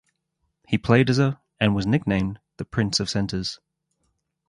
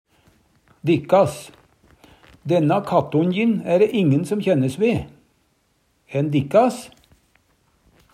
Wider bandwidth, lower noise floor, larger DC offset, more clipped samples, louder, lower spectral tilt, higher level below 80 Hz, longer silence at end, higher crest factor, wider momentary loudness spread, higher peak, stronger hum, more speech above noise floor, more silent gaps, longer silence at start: second, 11.5 kHz vs 15 kHz; first, -75 dBFS vs -65 dBFS; neither; neither; second, -23 LUFS vs -20 LUFS; second, -5.5 dB/octave vs -7.5 dB/octave; first, -48 dBFS vs -58 dBFS; second, 0.95 s vs 1.25 s; about the same, 20 dB vs 18 dB; about the same, 12 LU vs 11 LU; about the same, -4 dBFS vs -4 dBFS; neither; first, 53 dB vs 46 dB; neither; second, 0.7 s vs 0.85 s